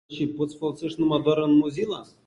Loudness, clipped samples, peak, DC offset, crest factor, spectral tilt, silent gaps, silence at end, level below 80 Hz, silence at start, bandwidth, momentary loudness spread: -24 LUFS; under 0.1%; -8 dBFS; under 0.1%; 16 dB; -7 dB/octave; none; 0.2 s; -62 dBFS; 0.1 s; 10 kHz; 10 LU